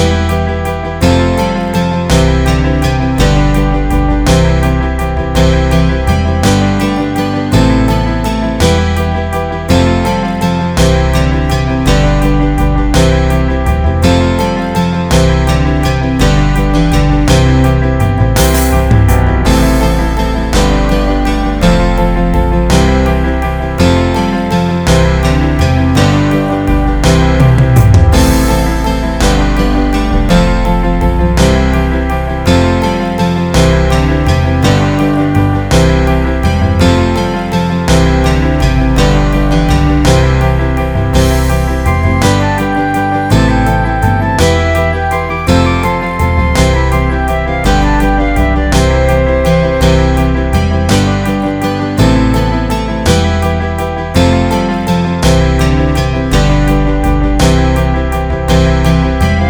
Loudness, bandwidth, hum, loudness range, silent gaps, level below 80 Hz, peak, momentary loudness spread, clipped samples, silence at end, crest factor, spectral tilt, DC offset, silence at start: -11 LUFS; over 20 kHz; none; 2 LU; none; -14 dBFS; 0 dBFS; 4 LU; 0.1%; 0 s; 10 dB; -6 dB/octave; under 0.1%; 0 s